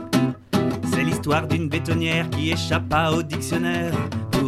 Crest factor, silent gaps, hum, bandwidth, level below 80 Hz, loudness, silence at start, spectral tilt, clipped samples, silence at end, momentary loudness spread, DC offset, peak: 16 dB; none; none; 15 kHz; -46 dBFS; -23 LUFS; 0 s; -5.5 dB/octave; under 0.1%; 0 s; 4 LU; under 0.1%; -6 dBFS